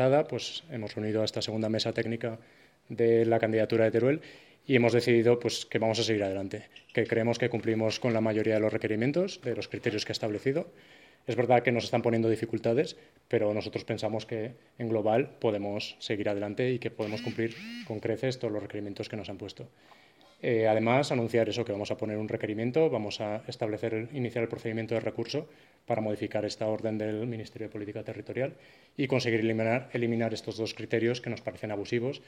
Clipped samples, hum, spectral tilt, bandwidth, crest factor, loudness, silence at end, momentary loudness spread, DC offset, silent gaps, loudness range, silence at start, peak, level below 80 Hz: under 0.1%; none; -6 dB/octave; 13 kHz; 22 dB; -30 LUFS; 0.1 s; 12 LU; under 0.1%; none; 6 LU; 0 s; -8 dBFS; -70 dBFS